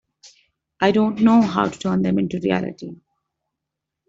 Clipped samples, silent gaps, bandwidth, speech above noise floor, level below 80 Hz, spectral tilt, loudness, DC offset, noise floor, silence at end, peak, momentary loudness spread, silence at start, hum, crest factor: under 0.1%; none; 7.8 kHz; 64 dB; -56 dBFS; -7 dB/octave; -19 LUFS; under 0.1%; -83 dBFS; 1.15 s; -4 dBFS; 13 LU; 0.25 s; none; 18 dB